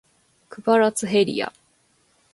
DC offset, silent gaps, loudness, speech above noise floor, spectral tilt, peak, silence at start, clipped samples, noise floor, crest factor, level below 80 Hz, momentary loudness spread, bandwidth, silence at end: under 0.1%; none; -21 LUFS; 43 dB; -4 dB/octave; -6 dBFS; 0.5 s; under 0.1%; -63 dBFS; 18 dB; -68 dBFS; 10 LU; 12 kHz; 0.85 s